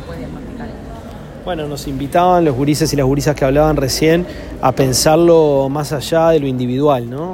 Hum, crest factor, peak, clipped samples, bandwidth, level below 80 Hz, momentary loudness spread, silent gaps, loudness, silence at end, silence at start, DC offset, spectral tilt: none; 14 dB; 0 dBFS; under 0.1%; 16.5 kHz; -34 dBFS; 18 LU; none; -14 LUFS; 0 s; 0 s; under 0.1%; -5.5 dB/octave